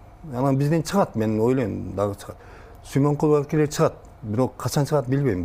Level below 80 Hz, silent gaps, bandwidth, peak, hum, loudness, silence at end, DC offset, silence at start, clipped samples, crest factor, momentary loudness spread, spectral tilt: -48 dBFS; none; 16 kHz; -6 dBFS; none; -23 LUFS; 0 s; under 0.1%; 0 s; under 0.1%; 16 dB; 10 LU; -7 dB/octave